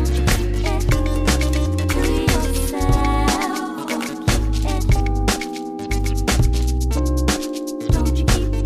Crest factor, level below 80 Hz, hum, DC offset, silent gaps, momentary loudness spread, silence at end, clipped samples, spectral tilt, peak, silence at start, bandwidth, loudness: 16 dB; -20 dBFS; none; under 0.1%; none; 6 LU; 0 s; under 0.1%; -5 dB/octave; -2 dBFS; 0 s; 15.5 kHz; -20 LUFS